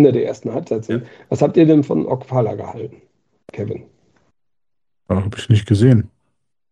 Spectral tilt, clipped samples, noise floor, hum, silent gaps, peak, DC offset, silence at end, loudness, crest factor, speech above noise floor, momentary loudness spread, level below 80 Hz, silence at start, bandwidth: -8.5 dB/octave; under 0.1%; -85 dBFS; none; none; 0 dBFS; under 0.1%; 0.65 s; -18 LUFS; 18 dB; 69 dB; 18 LU; -52 dBFS; 0 s; 10 kHz